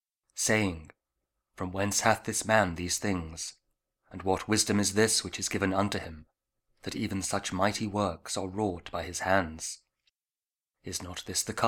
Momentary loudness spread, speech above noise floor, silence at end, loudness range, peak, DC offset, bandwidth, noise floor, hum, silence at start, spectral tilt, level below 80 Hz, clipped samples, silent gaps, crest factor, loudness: 13 LU; over 60 dB; 0 s; 4 LU; -6 dBFS; under 0.1%; 19 kHz; under -90 dBFS; none; 0.35 s; -3.5 dB/octave; -56 dBFS; under 0.1%; none; 24 dB; -30 LUFS